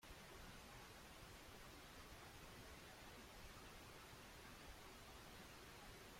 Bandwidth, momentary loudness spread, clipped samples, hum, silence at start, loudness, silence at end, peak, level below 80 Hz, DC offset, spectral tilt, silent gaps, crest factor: 16.5 kHz; 1 LU; under 0.1%; none; 0 s; -60 LUFS; 0 s; -46 dBFS; -68 dBFS; under 0.1%; -3 dB/octave; none; 14 dB